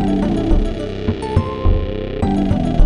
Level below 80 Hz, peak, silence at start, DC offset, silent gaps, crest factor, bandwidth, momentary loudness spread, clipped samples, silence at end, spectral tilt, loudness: -22 dBFS; 0 dBFS; 0 s; under 0.1%; none; 16 dB; 10 kHz; 5 LU; under 0.1%; 0 s; -8.5 dB/octave; -19 LUFS